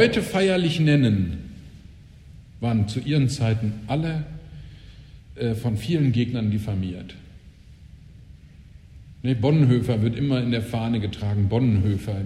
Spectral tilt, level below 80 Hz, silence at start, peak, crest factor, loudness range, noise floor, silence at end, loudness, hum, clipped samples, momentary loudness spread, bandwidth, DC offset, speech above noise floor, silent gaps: -7 dB/octave; -46 dBFS; 0 s; -4 dBFS; 18 dB; 5 LU; -46 dBFS; 0 s; -23 LUFS; none; under 0.1%; 17 LU; 13.5 kHz; under 0.1%; 25 dB; none